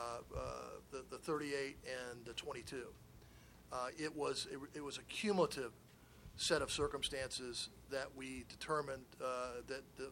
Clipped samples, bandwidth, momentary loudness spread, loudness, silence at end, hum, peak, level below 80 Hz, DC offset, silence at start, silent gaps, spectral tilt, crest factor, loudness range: under 0.1%; 17.5 kHz; 15 LU; -43 LUFS; 0 s; none; -20 dBFS; -64 dBFS; under 0.1%; 0 s; none; -3.5 dB/octave; 24 dB; 6 LU